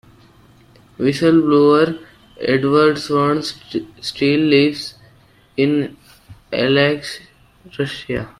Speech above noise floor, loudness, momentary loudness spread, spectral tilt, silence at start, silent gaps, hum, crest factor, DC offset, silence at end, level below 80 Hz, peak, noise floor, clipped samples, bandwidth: 34 dB; -17 LUFS; 16 LU; -6 dB/octave; 1 s; none; none; 16 dB; under 0.1%; 0.1 s; -52 dBFS; -2 dBFS; -50 dBFS; under 0.1%; 13 kHz